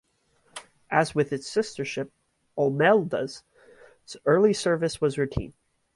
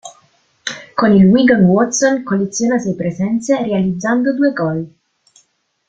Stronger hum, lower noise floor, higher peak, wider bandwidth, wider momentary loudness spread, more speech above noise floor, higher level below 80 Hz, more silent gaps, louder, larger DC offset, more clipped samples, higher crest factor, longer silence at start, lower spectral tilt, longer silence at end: neither; first, -66 dBFS vs -59 dBFS; second, -6 dBFS vs -2 dBFS; first, 11.5 kHz vs 8.8 kHz; first, 23 LU vs 14 LU; about the same, 42 dB vs 45 dB; about the same, -52 dBFS vs -50 dBFS; neither; second, -25 LUFS vs -14 LUFS; neither; neither; first, 20 dB vs 14 dB; first, 0.55 s vs 0.05 s; about the same, -5.5 dB/octave vs -5.5 dB/octave; second, 0.45 s vs 1 s